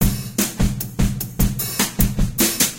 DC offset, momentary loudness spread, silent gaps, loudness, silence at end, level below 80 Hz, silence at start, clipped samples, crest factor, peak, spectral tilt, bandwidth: under 0.1%; 4 LU; none; -20 LUFS; 0 s; -26 dBFS; 0 s; under 0.1%; 18 dB; -2 dBFS; -3.5 dB/octave; 17.5 kHz